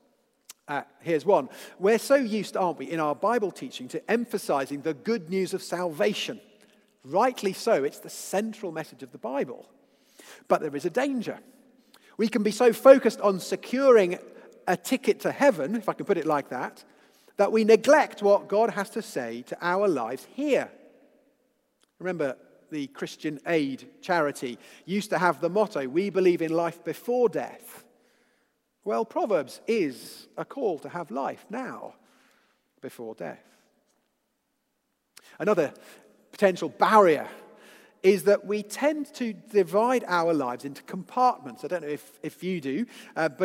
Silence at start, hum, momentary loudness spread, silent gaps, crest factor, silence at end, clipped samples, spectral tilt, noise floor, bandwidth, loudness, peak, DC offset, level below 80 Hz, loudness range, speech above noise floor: 0.7 s; none; 17 LU; none; 26 dB; 0 s; under 0.1%; -5 dB/octave; -77 dBFS; 16 kHz; -26 LUFS; -2 dBFS; under 0.1%; -84 dBFS; 10 LU; 51 dB